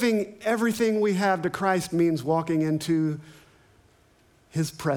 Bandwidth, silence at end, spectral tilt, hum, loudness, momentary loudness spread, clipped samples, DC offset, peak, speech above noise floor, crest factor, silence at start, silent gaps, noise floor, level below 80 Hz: 19.5 kHz; 0 s; -6 dB/octave; none; -25 LUFS; 7 LU; under 0.1%; under 0.1%; -10 dBFS; 36 dB; 16 dB; 0 s; none; -60 dBFS; -64 dBFS